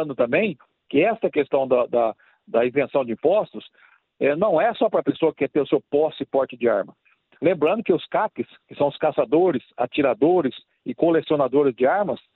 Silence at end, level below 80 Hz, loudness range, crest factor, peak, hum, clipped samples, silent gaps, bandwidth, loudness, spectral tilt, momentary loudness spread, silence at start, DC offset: 0.2 s; -66 dBFS; 2 LU; 16 dB; -4 dBFS; none; under 0.1%; none; 4.2 kHz; -22 LUFS; -10 dB/octave; 7 LU; 0 s; under 0.1%